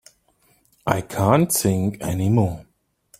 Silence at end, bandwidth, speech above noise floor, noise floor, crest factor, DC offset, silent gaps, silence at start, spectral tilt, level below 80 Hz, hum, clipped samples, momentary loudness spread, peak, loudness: 0.55 s; 16.5 kHz; 42 dB; -62 dBFS; 20 dB; under 0.1%; none; 0.85 s; -6 dB/octave; -50 dBFS; none; under 0.1%; 8 LU; -2 dBFS; -21 LUFS